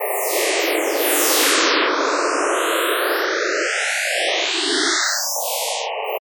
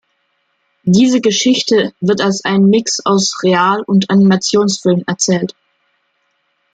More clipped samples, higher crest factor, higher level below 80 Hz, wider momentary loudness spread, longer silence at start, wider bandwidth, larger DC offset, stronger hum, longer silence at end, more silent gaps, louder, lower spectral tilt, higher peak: neither; about the same, 16 dB vs 12 dB; second, -86 dBFS vs -58 dBFS; about the same, 6 LU vs 4 LU; second, 0 s vs 0.85 s; first, over 20 kHz vs 9.2 kHz; neither; neither; second, 0.1 s vs 1.25 s; neither; second, -18 LUFS vs -13 LUFS; second, 2.5 dB/octave vs -4.5 dB/octave; about the same, -4 dBFS vs -2 dBFS